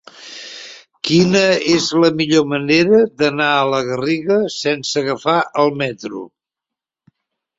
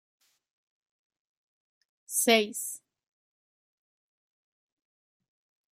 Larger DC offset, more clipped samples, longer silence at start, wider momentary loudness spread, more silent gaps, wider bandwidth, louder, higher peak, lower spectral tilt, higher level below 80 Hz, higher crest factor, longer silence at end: neither; neither; second, 0.2 s vs 2.1 s; first, 18 LU vs 15 LU; neither; second, 8 kHz vs 15.5 kHz; first, -15 LUFS vs -26 LUFS; first, -2 dBFS vs -8 dBFS; first, -4.5 dB/octave vs -1 dB/octave; first, -58 dBFS vs -88 dBFS; second, 16 dB vs 26 dB; second, 1.3 s vs 3 s